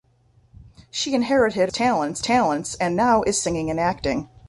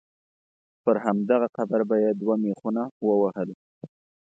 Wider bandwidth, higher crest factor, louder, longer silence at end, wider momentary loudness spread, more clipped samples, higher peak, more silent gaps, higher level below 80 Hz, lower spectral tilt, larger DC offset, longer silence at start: first, 11.5 kHz vs 7.8 kHz; about the same, 18 dB vs 18 dB; first, -21 LUFS vs -25 LUFS; second, 0.25 s vs 0.45 s; about the same, 7 LU vs 6 LU; neither; about the same, -6 dBFS vs -8 dBFS; second, none vs 2.91-3.01 s, 3.54-3.81 s; first, -48 dBFS vs -76 dBFS; second, -4 dB/octave vs -9.5 dB/octave; neither; second, 0.6 s vs 0.85 s